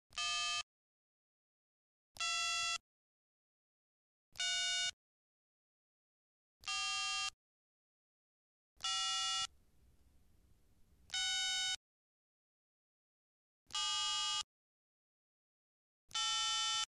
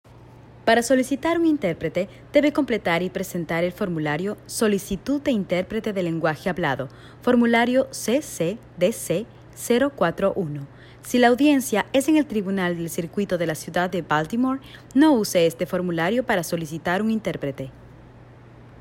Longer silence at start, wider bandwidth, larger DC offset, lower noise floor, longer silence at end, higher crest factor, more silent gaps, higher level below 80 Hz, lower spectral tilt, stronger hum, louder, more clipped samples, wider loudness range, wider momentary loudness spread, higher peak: about the same, 0.1 s vs 0.15 s; second, 13 kHz vs 16.5 kHz; neither; first, -70 dBFS vs -46 dBFS; about the same, 0.1 s vs 0.05 s; about the same, 22 dB vs 18 dB; first, 0.63-2.15 s, 2.80-4.32 s, 4.93-6.60 s, 7.33-8.76 s, 11.76-13.66 s, 14.44-16.08 s vs none; second, -76 dBFS vs -54 dBFS; second, 3.5 dB/octave vs -5 dB/octave; neither; second, -37 LUFS vs -23 LUFS; neither; about the same, 3 LU vs 3 LU; about the same, 9 LU vs 10 LU; second, -22 dBFS vs -4 dBFS